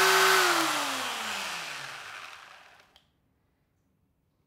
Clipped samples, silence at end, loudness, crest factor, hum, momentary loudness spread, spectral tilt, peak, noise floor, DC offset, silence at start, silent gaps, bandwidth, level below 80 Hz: under 0.1%; 1.9 s; -26 LUFS; 20 dB; none; 22 LU; -0.5 dB/octave; -10 dBFS; -72 dBFS; under 0.1%; 0 s; none; 16 kHz; -78 dBFS